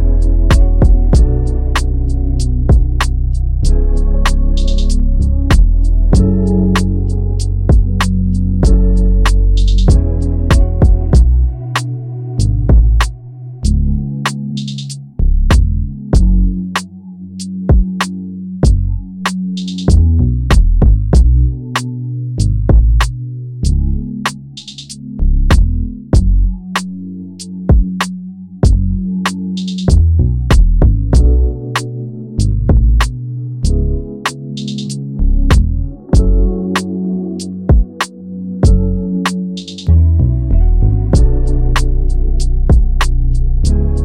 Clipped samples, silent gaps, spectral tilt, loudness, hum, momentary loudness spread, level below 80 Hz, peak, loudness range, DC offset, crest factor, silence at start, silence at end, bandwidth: under 0.1%; none; -6.5 dB/octave; -14 LUFS; none; 10 LU; -12 dBFS; 0 dBFS; 4 LU; under 0.1%; 10 dB; 0 s; 0 s; 11 kHz